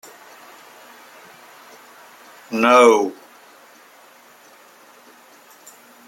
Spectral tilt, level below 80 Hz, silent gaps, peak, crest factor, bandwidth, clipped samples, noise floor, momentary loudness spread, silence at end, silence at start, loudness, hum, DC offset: -3 dB/octave; -74 dBFS; none; -2 dBFS; 22 dB; 16.5 kHz; under 0.1%; -48 dBFS; 31 LU; 2.95 s; 2.5 s; -15 LUFS; none; under 0.1%